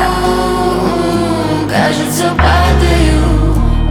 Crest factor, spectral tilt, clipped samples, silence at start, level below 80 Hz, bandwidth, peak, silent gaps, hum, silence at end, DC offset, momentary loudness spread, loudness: 10 dB; -5.5 dB/octave; under 0.1%; 0 s; -16 dBFS; 17.5 kHz; 0 dBFS; none; none; 0 s; under 0.1%; 4 LU; -12 LUFS